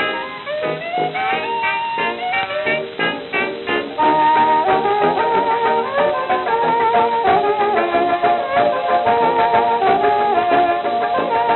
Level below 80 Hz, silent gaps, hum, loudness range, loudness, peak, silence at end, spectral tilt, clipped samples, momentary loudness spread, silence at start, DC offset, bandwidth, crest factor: -54 dBFS; none; none; 4 LU; -17 LUFS; -4 dBFS; 0 s; -8 dB/octave; under 0.1%; 6 LU; 0 s; under 0.1%; 4.3 kHz; 14 dB